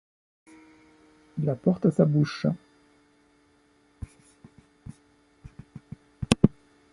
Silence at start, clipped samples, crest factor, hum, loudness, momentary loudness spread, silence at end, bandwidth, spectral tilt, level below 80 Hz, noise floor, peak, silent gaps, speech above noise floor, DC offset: 1.35 s; under 0.1%; 28 dB; none; -26 LUFS; 25 LU; 0.45 s; 11.5 kHz; -7 dB/octave; -50 dBFS; -63 dBFS; -2 dBFS; none; 39 dB; under 0.1%